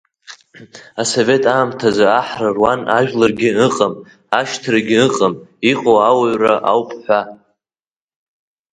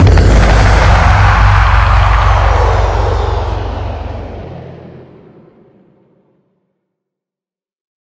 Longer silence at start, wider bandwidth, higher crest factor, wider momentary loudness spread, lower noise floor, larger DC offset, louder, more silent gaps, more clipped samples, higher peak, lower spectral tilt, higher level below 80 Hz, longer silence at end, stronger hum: first, 0.3 s vs 0 s; first, 9.6 kHz vs 8 kHz; first, 16 dB vs 10 dB; second, 6 LU vs 17 LU; about the same, under -90 dBFS vs -90 dBFS; neither; second, -15 LUFS vs -10 LUFS; neither; second, under 0.1% vs 0.6%; about the same, 0 dBFS vs 0 dBFS; second, -4.5 dB/octave vs -6 dB/octave; second, -54 dBFS vs -14 dBFS; second, 1.4 s vs 3 s; neither